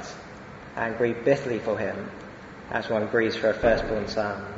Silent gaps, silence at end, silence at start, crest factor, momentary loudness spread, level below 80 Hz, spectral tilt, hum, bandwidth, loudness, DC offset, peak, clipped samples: none; 0 s; 0 s; 20 dB; 18 LU; -48 dBFS; -6 dB/octave; none; 8 kHz; -26 LUFS; under 0.1%; -8 dBFS; under 0.1%